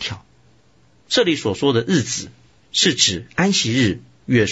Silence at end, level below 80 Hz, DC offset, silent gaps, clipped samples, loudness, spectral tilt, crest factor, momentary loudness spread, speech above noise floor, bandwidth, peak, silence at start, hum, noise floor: 0 s; -52 dBFS; under 0.1%; none; under 0.1%; -18 LUFS; -3.5 dB/octave; 18 dB; 12 LU; 37 dB; 8.2 kHz; -2 dBFS; 0 s; none; -56 dBFS